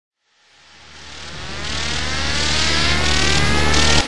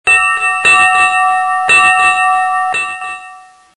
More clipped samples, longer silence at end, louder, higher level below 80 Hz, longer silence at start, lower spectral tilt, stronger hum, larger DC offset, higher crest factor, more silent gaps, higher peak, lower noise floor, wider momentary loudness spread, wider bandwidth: neither; second, 0 s vs 0.35 s; second, -17 LUFS vs -9 LUFS; first, -30 dBFS vs -48 dBFS; about the same, 0.1 s vs 0.05 s; first, -2.5 dB/octave vs 0.5 dB/octave; neither; second, under 0.1% vs 0.6%; first, 18 dB vs 12 dB; neither; about the same, -2 dBFS vs 0 dBFS; first, -55 dBFS vs -37 dBFS; first, 17 LU vs 12 LU; about the same, 11.5 kHz vs 11.5 kHz